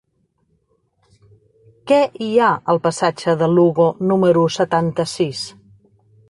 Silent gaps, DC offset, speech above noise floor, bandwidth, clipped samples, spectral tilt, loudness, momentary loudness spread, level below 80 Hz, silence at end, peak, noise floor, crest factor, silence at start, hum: none; under 0.1%; 49 dB; 11.5 kHz; under 0.1%; -6 dB/octave; -17 LUFS; 7 LU; -58 dBFS; 0.8 s; -4 dBFS; -65 dBFS; 16 dB; 1.85 s; none